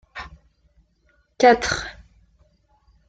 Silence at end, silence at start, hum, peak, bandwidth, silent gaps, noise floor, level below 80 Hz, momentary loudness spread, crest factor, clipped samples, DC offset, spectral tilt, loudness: 1.15 s; 0.15 s; none; -2 dBFS; 9.2 kHz; none; -63 dBFS; -48 dBFS; 22 LU; 22 dB; under 0.1%; under 0.1%; -3.5 dB/octave; -18 LUFS